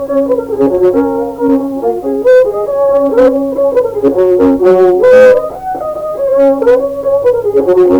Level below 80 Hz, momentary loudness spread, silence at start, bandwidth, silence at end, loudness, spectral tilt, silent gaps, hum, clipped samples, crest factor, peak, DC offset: -42 dBFS; 8 LU; 0 s; 19.5 kHz; 0 s; -10 LUFS; -7 dB/octave; none; none; 0.2%; 8 dB; 0 dBFS; under 0.1%